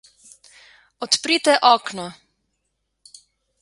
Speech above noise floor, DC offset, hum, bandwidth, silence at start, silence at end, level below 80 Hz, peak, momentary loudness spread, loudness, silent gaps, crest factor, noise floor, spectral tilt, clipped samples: 56 dB; under 0.1%; none; 11.5 kHz; 1 s; 1.5 s; -70 dBFS; 0 dBFS; 19 LU; -17 LUFS; none; 22 dB; -75 dBFS; -1.5 dB/octave; under 0.1%